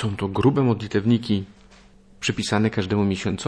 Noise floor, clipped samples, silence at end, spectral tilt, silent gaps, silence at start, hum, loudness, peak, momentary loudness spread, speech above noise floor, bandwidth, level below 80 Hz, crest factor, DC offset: -50 dBFS; under 0.1%; 0 s; -6 dB/octave; none; 0 s; none; -22 LUFS; -6 dBFS; 7 LU; 29 dB; 11 kHz; -50 dBFS; 16 dB; under 0.1%